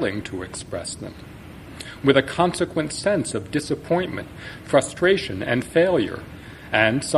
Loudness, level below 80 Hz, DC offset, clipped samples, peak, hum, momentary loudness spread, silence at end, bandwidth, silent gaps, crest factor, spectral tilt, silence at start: -22 LUFS; -48 dBFS; under 0.1%; under 0.1%; -2 dBFS; none; 18 LU; 0 s; 14 kHz; none; 22 dB; -4.5 dB/octave; 0 s